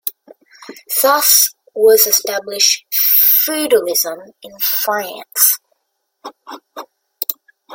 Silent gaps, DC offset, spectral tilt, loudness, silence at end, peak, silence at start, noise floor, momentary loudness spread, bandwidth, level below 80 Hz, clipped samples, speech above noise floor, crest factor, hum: none; under 0.1%; 1 dB/octave; -13 LUFS; 0 s; 0 dBFS; 0.05 s; -71 dBFS; 15 LU; over 20 kHz; -70 dBFS; under 0.1%; 56 dB; 16 dB; none